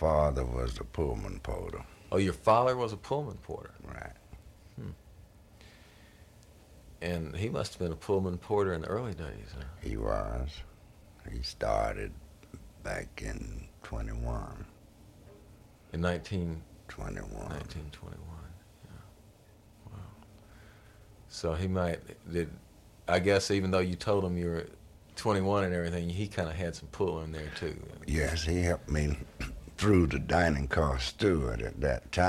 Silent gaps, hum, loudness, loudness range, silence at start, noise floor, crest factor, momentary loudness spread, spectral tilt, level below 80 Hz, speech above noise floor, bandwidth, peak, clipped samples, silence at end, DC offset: none; none; -33 LUFS; 15 LU; 0 s; -58 dBFS; 22 dB; 20 LU; -6 dB/octave; -44 dBFS; 26 dB; 15 kHz; -12 dBFS; under 0.1%; 0 s; under 0.1%